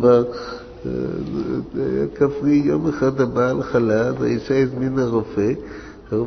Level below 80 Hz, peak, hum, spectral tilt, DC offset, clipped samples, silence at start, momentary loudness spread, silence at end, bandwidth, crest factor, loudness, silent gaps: -44 dBFS; -2 dBFS; none; -8 dB/octave; under 0.1%; under 0.1%; 0 s; 11 LU; 0 s; 6.4 kHz; 16 dB; -20 LUFS; none